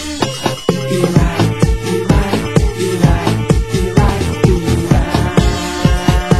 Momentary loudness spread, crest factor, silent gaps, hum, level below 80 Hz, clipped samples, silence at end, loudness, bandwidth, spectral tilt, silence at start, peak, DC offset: 4 LU; 14 dB; none; none; -20 dBFS; 0.3%; 0 s; -14 LUFS; 16 kHz; -6 dB/octave; 0 s; 0 dBFS; 2%